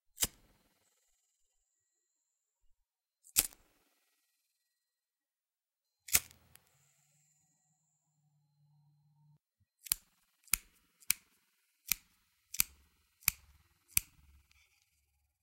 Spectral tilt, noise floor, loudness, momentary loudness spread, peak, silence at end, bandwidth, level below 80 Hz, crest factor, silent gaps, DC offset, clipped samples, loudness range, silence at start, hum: 0.5 dB/octave; under -90 dBFS; -35 LUFS; 14 LU; -2 dBFS; 1.4 s; 16.5 kHz; -64 dBFS; 42 dB; none; under 0.1%; under 0.1%; 4 LU; 0.2 s; none